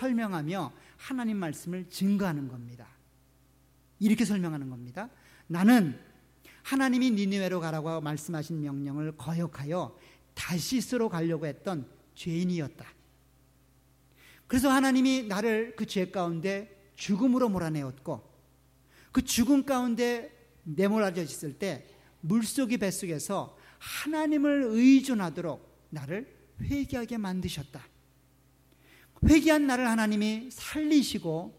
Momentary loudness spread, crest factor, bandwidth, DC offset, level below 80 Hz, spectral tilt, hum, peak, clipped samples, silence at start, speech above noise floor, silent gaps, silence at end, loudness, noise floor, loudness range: 17 LU; 20 dB; 16 kHz; under 0.1%; -52 dBFS; -5.5 dB/octave; none; -10 dBFS; under 0.1%; 0 s; 35 dB; none; 0.05 s; -29 LUFS; -63 dBFS; 7 LU